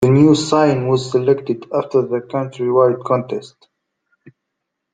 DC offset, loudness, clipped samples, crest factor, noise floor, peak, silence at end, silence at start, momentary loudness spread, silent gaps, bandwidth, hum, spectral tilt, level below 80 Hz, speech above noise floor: under 0.1%; -16 LUFS; under 0.1%; 16 dB; -77 dBFS; -2 dBFS; 1.45 s; 0 s; 9 LU; none; 9.4 kHz; none; -7 dB/octave; -56 dBFS; 61 dB